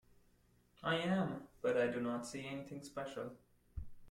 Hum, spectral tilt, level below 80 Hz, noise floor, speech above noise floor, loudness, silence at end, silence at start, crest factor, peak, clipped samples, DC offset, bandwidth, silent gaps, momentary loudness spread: none; -5.5 dB/octave; -62 dBFS; -71 dBFS; 32 dB; -40 LUFS; 0 s; 0.8 s; 18 dB; -24 dBFS; under 0.1%; under 0.1%; 14.5 kHz; none; 17 LU